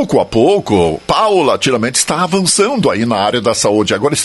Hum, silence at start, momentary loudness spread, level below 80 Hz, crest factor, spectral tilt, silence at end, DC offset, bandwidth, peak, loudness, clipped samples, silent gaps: none; 0 s; 2 LU; -42 dBFS; 12 dB; -4 dB/octave; 0 s; under 0.1%; 12 kHz; 0 dBFS; -12 LUFS; under 0.1%; none